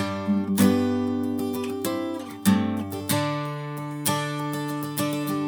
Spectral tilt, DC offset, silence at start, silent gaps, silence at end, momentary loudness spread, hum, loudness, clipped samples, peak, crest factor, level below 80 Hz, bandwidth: -5.5 dB/octave; under 0.1%; 0 s; none; 0 s; 9 LU; none; -26 LUFS; under 0.1%; -2 dBFS; 24 dB; -70 dBFS; over 20 kHz